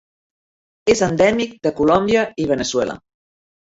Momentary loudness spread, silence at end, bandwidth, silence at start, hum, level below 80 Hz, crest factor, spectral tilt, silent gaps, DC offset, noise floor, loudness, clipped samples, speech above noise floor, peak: 8 LU; 0.8 s; 8 kHz; 0.85 s; none; -48 dBFS; 18 dB; -4.5 dB/octave; none; under 0.1%; under -90 dBFS; -18 LUFS; under 0.1%; over 73 dB; -2 dBFS